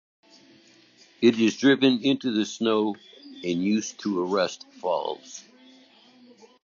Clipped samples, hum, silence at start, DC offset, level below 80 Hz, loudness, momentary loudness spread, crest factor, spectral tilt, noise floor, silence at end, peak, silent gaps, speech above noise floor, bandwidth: under 0.1%; none; 1.2 s; under 0.1%; -74 dBFS; -24 LUFS; 16 LU; 20 dB; -4.5 dB/octave; -56 dBFS; 1.25 s; -6 dBFS; none; 32 dB; 7.4 kHz